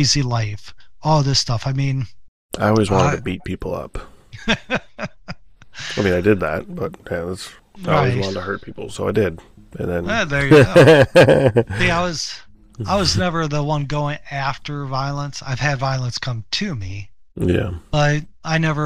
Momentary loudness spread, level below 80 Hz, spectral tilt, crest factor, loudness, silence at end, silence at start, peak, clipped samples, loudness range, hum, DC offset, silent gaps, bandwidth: 19 LU; -38 dBFS; -5.5 dB/octave; 18 dB; -19 LUFS; 0 s; 0 s; -2 dBFS; under 0.1%; 9 LU; none; 0.8%; 2.28-2.49 s; 14 kHz